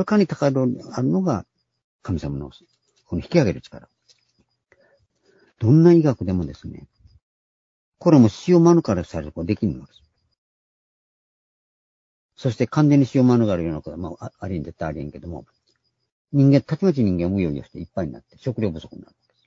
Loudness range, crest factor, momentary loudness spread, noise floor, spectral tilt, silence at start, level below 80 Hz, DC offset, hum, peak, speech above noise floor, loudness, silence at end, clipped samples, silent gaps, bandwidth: 8 LU; 20 dB; 18 LU; -69 dBFS; -8.5 dB/octave; 0 s; -48 dBFS; under 0.1%; none; -2 dBFS; 49 dB; -20 LUFS; 0.45 s; under 0.1%; 1.84-1.99 s, 7.22-7.92 s, 10.38-12.29 s, 16.12-16.25 s; 7.6 kHz